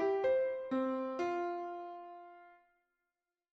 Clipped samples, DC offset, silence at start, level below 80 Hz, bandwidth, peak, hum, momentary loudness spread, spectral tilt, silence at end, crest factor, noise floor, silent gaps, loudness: under 0.1%; under 0.1%; 0 s; -80 dBFS; 7.2 kHz; -22 dBFS; none; 19 LU; -6 dB/octave; 1 s; 14 dB; under -90 dBFS; none; -36 LUFS